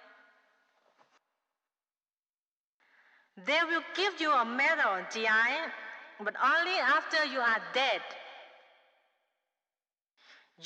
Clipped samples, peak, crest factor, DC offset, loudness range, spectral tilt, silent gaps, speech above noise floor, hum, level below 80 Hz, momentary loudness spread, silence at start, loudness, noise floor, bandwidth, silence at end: under 0.1%; -20 dBFS; 14 dB; under 0.1%; 8 LU; -2 dB/octave; none; over 60 dB; none; -86 dBFS; 13 LU; 3.35 s; -29 LUFS; under -90 dBFS; 10 kHz; 0 s